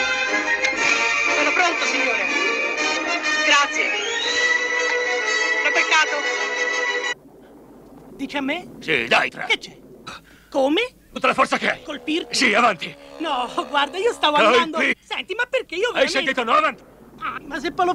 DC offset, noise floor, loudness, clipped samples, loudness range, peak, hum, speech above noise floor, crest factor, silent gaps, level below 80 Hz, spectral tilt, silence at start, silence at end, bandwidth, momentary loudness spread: under 0.1%; -46 dBFS; -19 LUFS; under 0.1%; 5 LU; -4 dBFS; none; 25 dB; 18 dB; none; -58 dBFS; -1.5 dB/octave; 0 s; 0 s; 15.5 kHz; 12 LU